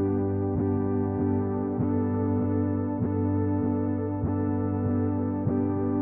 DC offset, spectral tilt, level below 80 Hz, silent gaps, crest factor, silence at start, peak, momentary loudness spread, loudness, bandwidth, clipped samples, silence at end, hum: under 0.1%; -13 dB/octave; -50 dBFS; none; 12 dB; 0 s; -14 dBFS; 2 LU; -27 LUFS; 2.8 kHz; under 0.1%; 0 s; none